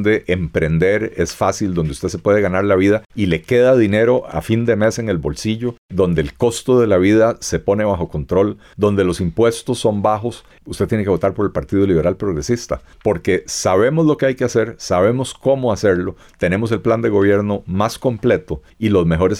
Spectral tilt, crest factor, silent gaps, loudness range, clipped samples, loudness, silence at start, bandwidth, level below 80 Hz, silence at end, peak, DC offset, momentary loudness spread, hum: -6 dB/octave; 12 dB; 3.06-3.10 s, 5.78-5.89 s; 3 LU; under 0.1%; -17 LUFS; 0 s; 15.5 kHz; -40 dBFS; 0 s; -4 dBFS; under 0.1%; 7 LU; none